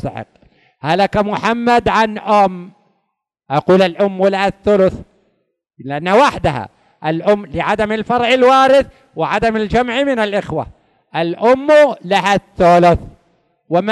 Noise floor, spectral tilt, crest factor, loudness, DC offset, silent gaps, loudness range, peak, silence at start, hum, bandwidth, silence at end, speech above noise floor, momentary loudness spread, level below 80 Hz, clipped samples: -72 dBFS; -6 dB/octave; 12 dB; -14 LUFS; under 0.1%; none; 3 LU; -2 dBFS; 0.05 s; none; 12 kHz; 0 s; 58 dB; 15 LU; -40 dBFS; under 0.1%